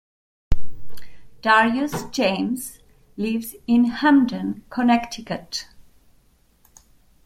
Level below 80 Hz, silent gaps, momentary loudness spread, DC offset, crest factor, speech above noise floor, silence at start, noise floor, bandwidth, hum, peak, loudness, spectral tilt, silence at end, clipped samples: -38 dBFS; none; 15 LU; under 0.1%; 18 dB; 38 dB; 0.5 s; -59 dBFS; 16 kHz; none; -4 dBFS; -22 LUFS; -4.5 dB/octave; 1.45 s; under 0.1%